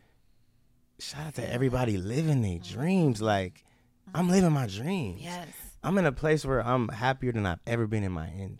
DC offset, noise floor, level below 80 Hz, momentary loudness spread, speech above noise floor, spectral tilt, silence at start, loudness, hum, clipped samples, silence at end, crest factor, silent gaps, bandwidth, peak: under 0.1%; -64 dBFS; -50 dBFS; 12 LU; 36 dB; -6.5 dB/octave; 1 s; -29 LUFS; none; under 0.1%; 0 s; 18 dB; none; 15.5 kHz; -10 dBFS